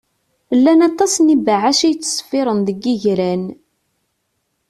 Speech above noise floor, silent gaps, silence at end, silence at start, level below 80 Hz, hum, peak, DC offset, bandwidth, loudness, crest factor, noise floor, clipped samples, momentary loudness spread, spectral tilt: 55 dB; none; 1.15 s; 0.5 s; -58 dBFS; none; -2 dBFS; under 0.1%; 13.5 kHz; -15 LUFS; 14 dB; -69 dBFS; under 0.1%; 8 LU; -4 dB/octave